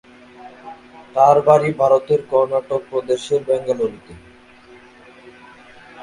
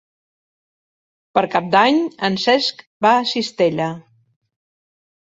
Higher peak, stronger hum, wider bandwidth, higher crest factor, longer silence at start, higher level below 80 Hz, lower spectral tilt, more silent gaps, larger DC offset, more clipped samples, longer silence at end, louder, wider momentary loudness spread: about the same, 0 dBFS vs -2 dBFS; neither; first, 11.5 kHz vs 8 kHz; about the same, 20 dB vs 18 dB; second, 0.45 s vs 1.35 s; first, -58 dBFS vs -64 dBFS; first, -6 dB/octave vs -4.5 dB/octave; second, none vs 2.87-3.00 s; neither; neither; second, 0 s vs 1.3 s; about the same, -17 LUFS vs -18 LUFS; first, 20 LU vs 9 LU